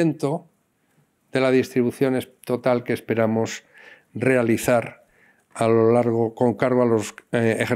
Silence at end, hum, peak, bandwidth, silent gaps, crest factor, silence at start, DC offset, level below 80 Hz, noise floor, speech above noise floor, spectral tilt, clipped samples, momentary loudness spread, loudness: 0 s; none; -6 dBFS; 16 kHz; none; 16 dB; 0 s; under 0.1%; -64 dBFS; -66 dBFS; 45 dB; -6.5 dB/octave; under 0.1%; 10 LU; -22 LUFS